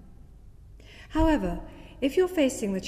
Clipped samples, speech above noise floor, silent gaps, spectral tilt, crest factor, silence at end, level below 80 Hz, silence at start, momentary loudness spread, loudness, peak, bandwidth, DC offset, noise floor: under 0.1%; 23 dB; none; -5.5 dB/octave; 16 dB; 0 s; -38 dBFS; 0.05 s; 12 LU; -26 LUFS; -12 dBFS; 15.5 kHz; under 0.1%; -49 dBFS